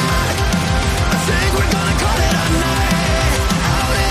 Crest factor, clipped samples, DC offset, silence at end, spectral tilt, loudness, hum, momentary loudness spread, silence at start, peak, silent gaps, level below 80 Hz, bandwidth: 10 dB; under 0.1%; under 0.1%; 0 s; -4.5 dB/octave; -16 LUFS; none; 1 LU; 0 s; -4 dBFS; none; -22 dBFS; 15.5 kHz